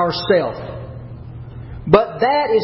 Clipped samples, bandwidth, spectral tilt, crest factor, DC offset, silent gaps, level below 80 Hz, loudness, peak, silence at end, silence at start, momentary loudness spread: under 0.1%; 5.8 kHz; -9 dB/octave; 18 dB; under 0.1%; none; -40 dBFS; -16 LUFS; 0 dBFS; 0 s; 0 s; 19 LU